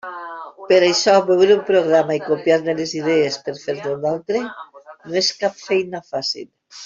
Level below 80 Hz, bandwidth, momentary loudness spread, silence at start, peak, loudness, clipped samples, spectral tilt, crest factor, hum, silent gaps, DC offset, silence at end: -64 dBFS; 7.6 kHz; 17 LU; 0.05 s; -2 dBFS; -18 LUFS; under 0.1%; -4 dB/octave; 16 dB; none; none; under 0.1%; 0 s